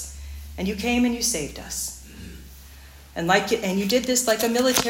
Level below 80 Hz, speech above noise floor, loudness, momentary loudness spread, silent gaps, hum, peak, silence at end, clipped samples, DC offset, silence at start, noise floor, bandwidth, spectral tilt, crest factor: -44 dBFS; 22 dB; -23 LUFS; 19 LU; none; none; -2 dBFS; 0 s; under 0.1%; under 0.1%; 0 s; -45 dBFS; 17 kHz; -3 dB/octave; 22 dB